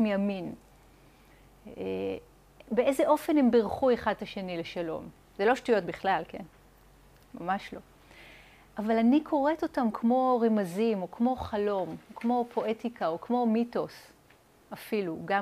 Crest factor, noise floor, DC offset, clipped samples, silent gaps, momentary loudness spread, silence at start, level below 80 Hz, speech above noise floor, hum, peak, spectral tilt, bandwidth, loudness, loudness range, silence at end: 16 dB; -60 dBFS; under 0.1%; under 0.1%; none; 15 LU; 0 s; -60 dBFS; 32 dB; none; -12 dBFS; -6.5 dB/octave; 15.5 kHz; -29 LUFS; 5 LU; 0 s